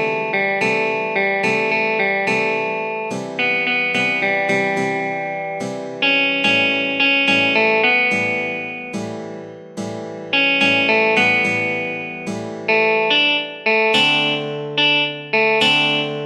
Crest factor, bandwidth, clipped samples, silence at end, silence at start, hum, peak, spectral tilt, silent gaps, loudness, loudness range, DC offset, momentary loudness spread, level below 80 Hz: 16 dB; 12.5 kHz; under 0.1%; 0 s; 0 s; none; -2 dBFS; -4 dB/octave; none; -16 LUFS; 3 LU; under 0.1%; 13 LU; -68 dBFS